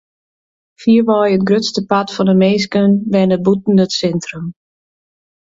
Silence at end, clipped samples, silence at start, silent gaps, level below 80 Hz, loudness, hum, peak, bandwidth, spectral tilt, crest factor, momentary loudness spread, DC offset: 0.9 s; under 0.1%; 0.8 s; none; -54 dBFS; -14 LUFS; none; 0 dBFS; 7.8 kHz; -6.5 dB/octave; 14 dB; 9 LU; under 0.1%